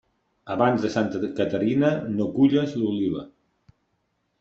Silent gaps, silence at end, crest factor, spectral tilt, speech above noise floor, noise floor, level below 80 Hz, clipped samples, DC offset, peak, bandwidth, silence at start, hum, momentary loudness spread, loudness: none; 1.15 s; 20 dB; -7.5 dB/octave; 50 dB; -73 dBFS; -62 dBFS; under 0.1%; under 0.1%; -6 dBFS; 7.6 kHz; 0.45 s; none; 7 LU; -24 LUFS